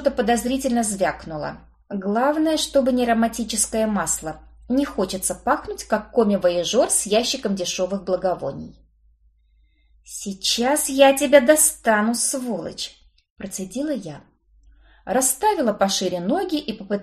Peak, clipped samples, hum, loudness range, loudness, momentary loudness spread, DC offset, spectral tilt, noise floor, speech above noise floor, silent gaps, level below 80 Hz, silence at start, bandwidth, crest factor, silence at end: 0 dBFS; under 0.1%; none; 7 LU; -21 LUFS; 16 LU; under 0.1%; -3 dB/octave; -59 dBFS; 38 dB; 13.30-13.36 s; -50 dBFS; 0 s; 13 kHz; 22 dB; 0 s